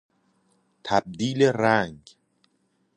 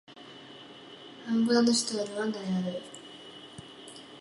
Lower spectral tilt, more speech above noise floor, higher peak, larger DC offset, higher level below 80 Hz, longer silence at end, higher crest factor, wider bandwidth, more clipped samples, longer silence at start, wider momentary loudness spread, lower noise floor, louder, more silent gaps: first, -5.5 dB/octave vs -4 dB/octave; first, 47 dB vs 21 dB; first, -4 dBFS vs -14 dBFS; neither; first, -62 dBFS vs -74 dBFS; first, 1 s vs 0 s; about the same, 22 dB vs 18 dB; about the same, 10.5 kHz vs 11.5 kHz; neither; first, 0.85 s vs 0.1 s; second, 12 LU vs 23 LU; first, -70 dBFS vs -49 dBFS; first, -23 LUFS vs -28 LUFS; neither